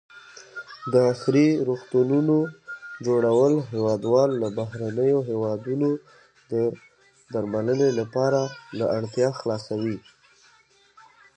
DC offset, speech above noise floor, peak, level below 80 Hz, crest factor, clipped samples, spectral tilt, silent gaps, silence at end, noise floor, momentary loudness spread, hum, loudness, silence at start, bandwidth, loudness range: under 0.1%; 36 dB; -8 dBFS; -66 dBFS; 16 dB; under 0.1%; -7.5 dB/octave; none; 1.35 s; -59 dBFS; 12 LU; none; -24 LUFS; 0.15 s; 9.4 kHz; 5 LU